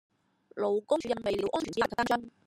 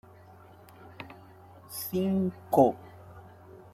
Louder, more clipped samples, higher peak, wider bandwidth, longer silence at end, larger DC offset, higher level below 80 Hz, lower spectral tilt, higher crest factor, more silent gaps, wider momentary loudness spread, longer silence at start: second, -31 LUFS vs -28 LUFS; neither; second, -14 dBFS vs -8 dBFS; about the same, 15.5 kHz vs 15.5 kHz; about the same, 0.15 s vs 0.2 s; neither; about the same, -62 dBFS vs -66 dBFS; second, -4.5 dB/octave vs -7 dB/octave; second, 18 dB vs 24 dB; neither; second, 4 LU vs 27 LU; second, 0.55 s vs 0.8 s